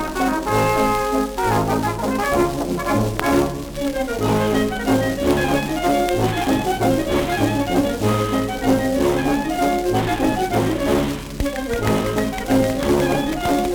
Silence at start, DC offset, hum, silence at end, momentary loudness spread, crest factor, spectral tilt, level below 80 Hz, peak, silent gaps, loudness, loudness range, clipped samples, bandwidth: 0 s; under 0.1%; none; 0 s; 4 LU; 18 dB; -5.5 dB/octave; -34 dBFS; 0 dBFS; none; -20 LUFS; 1 LU; under 0.1%; over 20 kHz